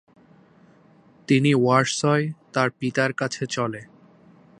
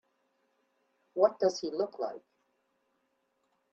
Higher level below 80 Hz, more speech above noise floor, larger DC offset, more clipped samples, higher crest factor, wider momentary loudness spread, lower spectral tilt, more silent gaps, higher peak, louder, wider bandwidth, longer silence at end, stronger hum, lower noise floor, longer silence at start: first, -68 dBFS vs -82 dBFS; second, 33 dB vs 47 dB; neither; neither; about the same, 22 dB vs 24 dB; second, 9 LU vs 14 LU; about the same, -5 dB/octave vs -4.5 dB/octave; neither; first, -2 dBFS vs -12 dBFS; first, -22 LUFS vs -31 LUFS; first, 10.5 kHz vs 7.8 kHz; second, 0.75 s vs 1.55 s; neither; second, -54 dBFS vs -77 dBFS; first, 1.3 s vs 1.15 s